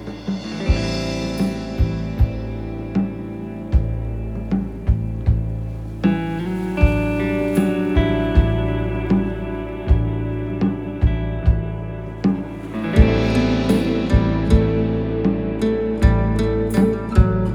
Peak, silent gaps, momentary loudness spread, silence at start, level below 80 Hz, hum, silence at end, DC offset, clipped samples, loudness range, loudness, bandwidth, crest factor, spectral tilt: 0 dBFS; none; 10 LU; 0 s; -24 dBFS; none; 0 s; under 0.1%; under 0.1%; 5 LU; -21 LUFS; 16 kHz; 18 dB; -8 dB/octave